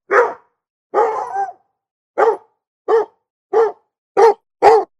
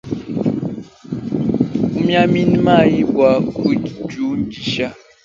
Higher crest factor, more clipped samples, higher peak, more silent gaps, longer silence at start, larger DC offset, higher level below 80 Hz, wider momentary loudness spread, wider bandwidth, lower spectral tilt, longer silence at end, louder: about the same, 16 dB vs 16 dB; neither; about the same, 0 dBFS vs 0 dBFS; first, 0.70-0.90 s, 1.91-2.14 s, 2.67-2.85 s, 3.30-3.50 s, 3.98-4.15 s vs none; about the same, 0.1 s vs 0.05 s; neither; second, -64 dBFS vs -46 dBFS; about the same, 15 LU vs 13 LU; first, 10 kHz vs 7.6 kHz; second, -4 dB/octave vs -7.5 dB/octave; second, 0.15 s vs 0.3 s; about the same, -17 LUFS vs -17 LUFS